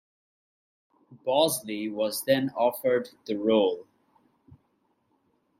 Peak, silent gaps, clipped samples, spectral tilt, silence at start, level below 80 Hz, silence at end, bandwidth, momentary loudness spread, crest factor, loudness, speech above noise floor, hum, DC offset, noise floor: -8 dBFS; none; under 0.1%; -4 dB/octave; 1.1 s; -76 dBFS; 1.8 s; 16 kHz; 10 LU; 20 dB; -26 LUFS; 46 dB; none; under 0.1%; -72 dBFS